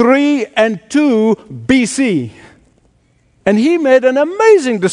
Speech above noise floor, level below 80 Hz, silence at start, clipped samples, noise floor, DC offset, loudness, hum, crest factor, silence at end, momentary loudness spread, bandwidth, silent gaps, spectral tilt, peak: 43 dB; -50 dBFS; 0 s; under 0.1%; -54 dBFS; under 0.1%; -12 LUFS; none; 12 dB; 0 s; 7 LU; 11 kHz; none; -5 dB/octave; 0 dBFS